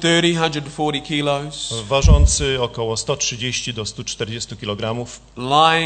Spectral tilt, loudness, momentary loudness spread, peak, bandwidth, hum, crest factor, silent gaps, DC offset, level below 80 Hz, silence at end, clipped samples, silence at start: -4 dB/octave; -19 LUFS; 12 LU; 0 dBFS; 9.2 kHz; none; 18 dB; none; under 0.1%; -24 dBFS; 0 s; under 0.1%; 0 s